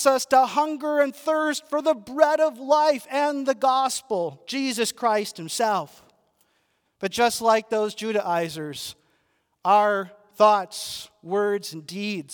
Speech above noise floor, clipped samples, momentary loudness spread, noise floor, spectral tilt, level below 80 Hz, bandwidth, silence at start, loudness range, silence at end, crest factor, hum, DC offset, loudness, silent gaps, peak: 47 dB; under 0.1%; 12 LU; -70 dBFS; -3 dB/octave; -72 dBFS; over 20 kHz; 0 s; 4 LU; 0 s; 20 dB; none; under 0.1%; -23 LUFS; none; -4 dBFS